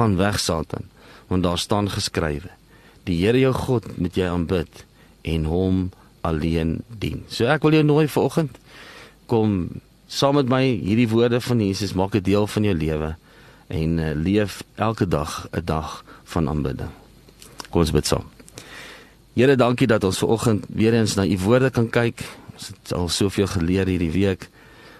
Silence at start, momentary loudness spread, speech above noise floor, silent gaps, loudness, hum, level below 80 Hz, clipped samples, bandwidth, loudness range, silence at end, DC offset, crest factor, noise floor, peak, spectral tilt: 0 s; 17 LU; 26 dB; none; -21 LUFS; none; -40 dBFS; under 0.1%; 13 kHz; 5 LU; 0.1 s; under 0.1%; 18 dB; -47 dBFS; -2 dBFS; -6 dB/octave